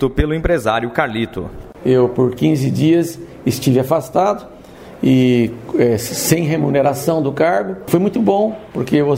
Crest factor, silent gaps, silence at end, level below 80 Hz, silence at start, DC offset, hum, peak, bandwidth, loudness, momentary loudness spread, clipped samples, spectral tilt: 16 dB; none; 0 s; -36 dBFS; 0 s; under 0.1%; none; 0 dBFS; 16.5 kHz; -16 LUFS; 8 LU; under 0.1%; -6 dB/octave